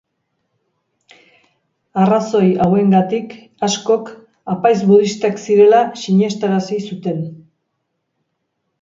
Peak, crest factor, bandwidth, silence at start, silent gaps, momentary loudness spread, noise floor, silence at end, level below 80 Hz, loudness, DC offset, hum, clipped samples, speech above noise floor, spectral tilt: 0 dBFS; 16 dB; 7.6 kHz; 1.95 s; none; 14 LU; -72 dBFS; 1.45 s; -60 dBFS; -15 LUFS; under 0.1%; none; under 0.1%; 58 dB; -6.5 dB/octave